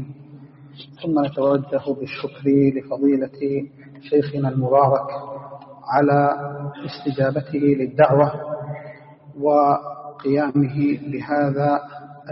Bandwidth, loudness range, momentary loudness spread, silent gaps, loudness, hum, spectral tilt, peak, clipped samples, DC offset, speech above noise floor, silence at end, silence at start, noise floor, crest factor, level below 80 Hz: 5.8 kHz; 2 LU; 18 LU; none; -20 LUFS; none; -7 dB/octave; -2 dBFS; under 0.1%; under 0.1%; 24 dB; 0 s; 0 s; -43 dBFS; 20 dB; -60 dBFS